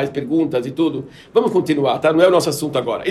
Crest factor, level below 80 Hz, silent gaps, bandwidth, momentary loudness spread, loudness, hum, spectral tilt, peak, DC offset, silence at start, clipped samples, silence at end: 16 dB; -58 dBFS; none; 14 kHz; 7 LU; -17 LUFS; none; -5.5 dB/octave; 0 dBFS; under 0.1%; 0 s; under 0.1%; 0 s